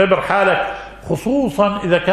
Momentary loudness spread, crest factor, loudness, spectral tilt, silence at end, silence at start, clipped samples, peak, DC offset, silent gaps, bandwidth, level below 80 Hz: 10 LU; 16 dB; -17 LUFS; -6 dB/octave; 0 s; 0 s; under 0.1%; 0 dBFS; under 0.1%; none; 13.5 kHz; -42 dBFS